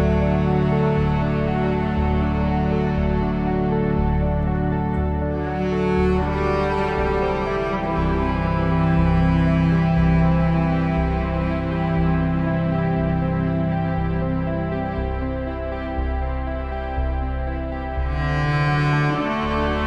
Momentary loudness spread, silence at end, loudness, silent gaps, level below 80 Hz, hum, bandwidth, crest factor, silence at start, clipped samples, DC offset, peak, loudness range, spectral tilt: 8 LU; 0 s; -21 LUFS; none; -28 dBFS; none; 6.6 kHz; 12 dB; 0 s; under 0.1%; under 0.1%; -8 dBFS; 6 LU; -9 dB/octave